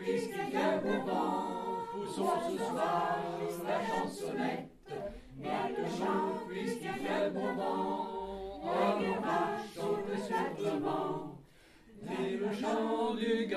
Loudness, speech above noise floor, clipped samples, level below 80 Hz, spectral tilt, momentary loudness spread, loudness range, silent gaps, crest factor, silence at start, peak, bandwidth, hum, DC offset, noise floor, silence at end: -35 LUFS; 26 dB; under 0.1%; -64 dBFS; -5.5 dB/octave; 9 LU; 3 LU; none; 18 dB; 0 s; -18 dBFS; 15 kHz; none; under 0.1%; -59 dBFS; 0 s